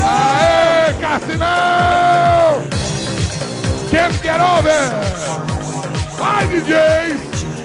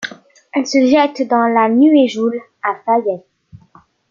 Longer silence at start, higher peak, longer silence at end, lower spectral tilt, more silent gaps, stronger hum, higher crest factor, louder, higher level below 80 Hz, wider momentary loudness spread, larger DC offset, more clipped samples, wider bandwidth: about the same, 0 s vs 0 s; about the same, -2 dBFS vs -2 dBFS; second, 0 s vs 0.55 s; about the same, -4.5 dB/octave vs -4.5 dB/octave; neither; neither; about the same, 12 dB vs 14 dB; about the same, -15 LUFS vs -14 LUFS; first, -34 dBFS vs -60 dBFS; about the same, 10 LU vs 12 LU; neither; neither; first, 11 kHz vs 7.4 kHz